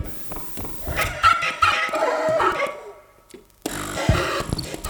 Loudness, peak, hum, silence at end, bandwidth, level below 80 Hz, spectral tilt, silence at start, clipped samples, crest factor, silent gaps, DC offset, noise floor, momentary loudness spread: -22 LUFS; -4 dBFS; none; 0 s; over 20 kHz; -38 dBFS; -4 dB/octave; 0 s; under 0.1%; 18 dB; none; under 0.1%; -48 dBFS; 11 LU